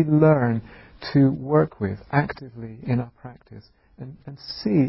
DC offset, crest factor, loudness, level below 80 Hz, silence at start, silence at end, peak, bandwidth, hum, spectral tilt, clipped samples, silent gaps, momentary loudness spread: under 0.1%; 18 dB; -22 LUFS; -52 dBFS; 0 s; 0 s; -6 dBFS; 5.8 kHz; none; -12 dB/octave; under 0.1%; none; 22 LU